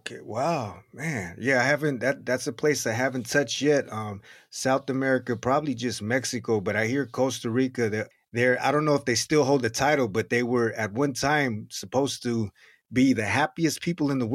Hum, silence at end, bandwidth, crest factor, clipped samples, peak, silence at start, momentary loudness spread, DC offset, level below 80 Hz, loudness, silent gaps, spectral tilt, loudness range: none; 0 s; 15 kHz; 18 dB; under 0.1%; -8 dBFS; 0.05 s; 9 LU; under 0.1%; -62 dBFS; -26 LUFS; none; -4.5 dB/octave; 3 LU